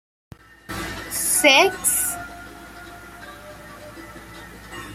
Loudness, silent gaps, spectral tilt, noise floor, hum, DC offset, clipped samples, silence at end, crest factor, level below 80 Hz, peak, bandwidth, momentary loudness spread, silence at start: -18 LUFS; none; -1 dB/octave; -40 dBFS; none; under 0.1%; under 0.1%; 0 s; 24 dB; -48 dBFS; 0 dBFS; 16 kHz; 26 LU; 0.7 s